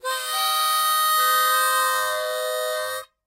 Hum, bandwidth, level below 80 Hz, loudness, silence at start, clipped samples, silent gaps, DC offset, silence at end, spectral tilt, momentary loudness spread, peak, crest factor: none; 16 kHz; -82 dBFS; -21 LUFS; 0.05 s; under 0.1%; none; under 0.1%; 0.2 s; 3 dB/octave; 8 LU; -10 dBFS; 14 dB